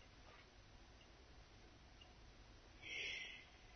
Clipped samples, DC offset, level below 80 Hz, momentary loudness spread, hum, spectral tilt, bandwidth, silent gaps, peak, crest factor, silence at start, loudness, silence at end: under 0.1%; under 0.1%; -68 dBFS; 18 LU; none; -0.5 dB/octave; 6.4 kHz; none; -36 dBFS; 20 dB; 0 s; -52 LUFS; 0 s